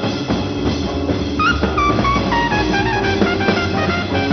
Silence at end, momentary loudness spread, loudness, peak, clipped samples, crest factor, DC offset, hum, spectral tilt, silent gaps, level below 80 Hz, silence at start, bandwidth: 0 s; 4 LU; -17 LUFS; 0 dBFS; under 0.1%; 16 dB; under 0.1%; none; -6 dB/octave; none; -30 dBFS; 0 s; 6.8 kHz